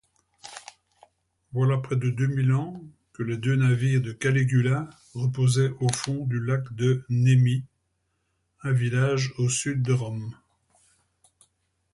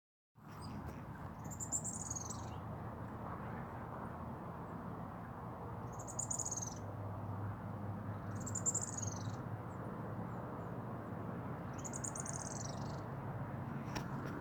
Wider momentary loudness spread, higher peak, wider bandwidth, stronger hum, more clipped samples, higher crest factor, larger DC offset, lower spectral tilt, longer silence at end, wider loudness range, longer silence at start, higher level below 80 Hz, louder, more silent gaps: first, 14 LU vs 9 LU; first, -6 dBFS vs -24 dBFS; second, 11.5 kHz vs over 20 kHz; neither; neither; about the same, 18 dB vs 20 dB; neither; first, -6 dB/octave vs -4.5 dB/octave; first, 1.6 s vs 0 s; about the same, 3 LU vs 5 LU; about the same, 0.45 s vs 0.35 s; about the same, -60 dBFS vs -62 dBFS; first, -25 LUFS vs -44 LUFS; neither